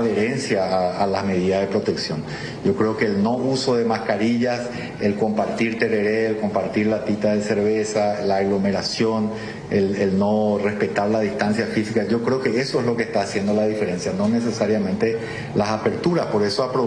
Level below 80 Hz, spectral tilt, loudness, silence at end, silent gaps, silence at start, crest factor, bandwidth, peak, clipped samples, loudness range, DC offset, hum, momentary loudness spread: -54 dBFS; -6 dB/octave; -21 LUFS; 0 s; none; 0 s; 16 dB; 10.5 kHz; -6 dBFS; under 0.1%; 1 LU; under 0.1%; none; 4 LU